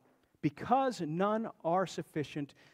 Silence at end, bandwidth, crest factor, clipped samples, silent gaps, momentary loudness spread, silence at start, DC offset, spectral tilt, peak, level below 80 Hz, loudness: 0.25 s; 15.5 kHz; 20 dB; under 0.1%; none; 8 LU; 0.45 s; under 0.1%; -6.5 dB/octave; -14 dBFS; -74 dBFS; -34 LUFS